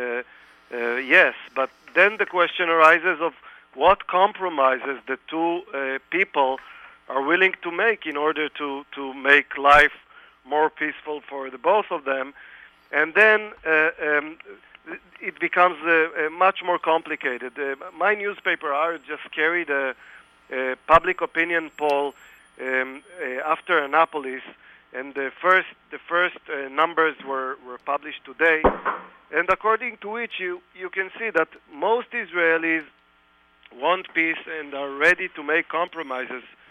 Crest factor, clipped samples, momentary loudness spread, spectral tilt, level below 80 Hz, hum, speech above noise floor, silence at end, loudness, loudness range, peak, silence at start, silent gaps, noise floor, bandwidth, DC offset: 22 dB; under 0.1%; 15 LU; -4.5 dB/octave; -52 dBFS; none; 37 dB; 0.3 s; -22 LUFS; 5 LU; -2 dBFS; 0 s; none; -59 dBFS; 13 kHz; under 0.1%